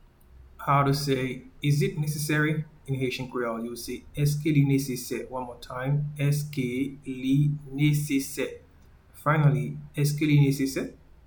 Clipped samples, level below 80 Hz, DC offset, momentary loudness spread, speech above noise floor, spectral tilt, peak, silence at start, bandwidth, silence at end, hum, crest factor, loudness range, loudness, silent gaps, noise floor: under 0.1%; -52 dBFS; under 0.1%; 11 LU; 28 dB; -6.5 dB/octave; -10 dBFS; 0.35 s; 19 kHz; 0.35 s; none; 18 dB; 2 LU; -27 LUFS; none; -54 dBFS